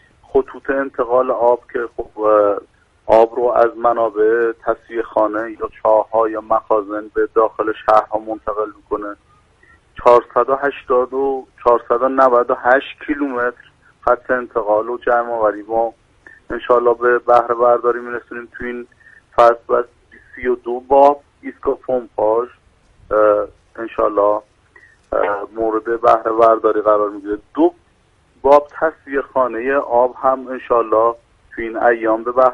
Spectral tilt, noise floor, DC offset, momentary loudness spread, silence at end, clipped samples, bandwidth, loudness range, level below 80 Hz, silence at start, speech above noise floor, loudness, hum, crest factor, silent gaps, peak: -6.5 dB/octave; -56 dBFS; under 0.1%; 12 LU; 0 s; under 0.1%; 7.4 kHz; 3 LU; -48 dBFS; 0.35 s; 40 dB; -17 LUFS; none; 16 dB; none; 0 dBFS